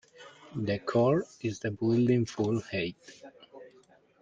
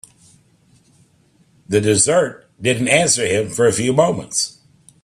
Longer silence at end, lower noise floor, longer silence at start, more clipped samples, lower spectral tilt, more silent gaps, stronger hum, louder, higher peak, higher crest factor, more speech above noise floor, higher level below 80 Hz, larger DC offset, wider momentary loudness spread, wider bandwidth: about the same, 0.55 s vs 0.55 s; first, -61 dBFS vs -56 dBFS; second, 0.2 s vs 1.7 s; neither; first, -7 dB/octave vs -3.5 dB/octave; neither; neither; second, -30 LUFS vs -17 LUFS; second, -14 dBFS vs 0 dBFS; about the same, 16 dB vs 20 dB; second, 32 dB vs 40 dB; second, -66 dBFS vs -54 dBFS; neither; first, 24 LU vs 7 LU; second, 7.8 kHz vs 14 kHz